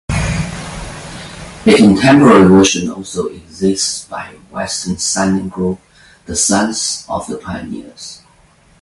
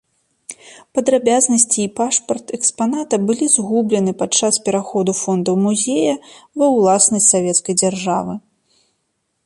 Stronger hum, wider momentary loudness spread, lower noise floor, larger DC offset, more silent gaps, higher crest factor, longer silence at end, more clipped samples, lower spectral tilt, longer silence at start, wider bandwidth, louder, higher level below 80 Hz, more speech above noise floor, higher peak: neither; first, 21 LU vs 12 LU; second, -49 dBFS vs -70 dBFS; neither; neither; about the same, 14 dB vs 18 dB; second, 0.65 s vs 1.05 s; neither; about the same, -4.5 dB/octave vs -3.5 dB/octave; second, 0.1 s vs 0.5 s; about the same, 11.5 kHz vs 11.5 kHz; first, -13 LUFS vs -16 LUFS; first, -34 dBFS vs -62 dBFS; second, 36 dB vs 54 dB; about the same, 0 dBFS vs 0 dBFS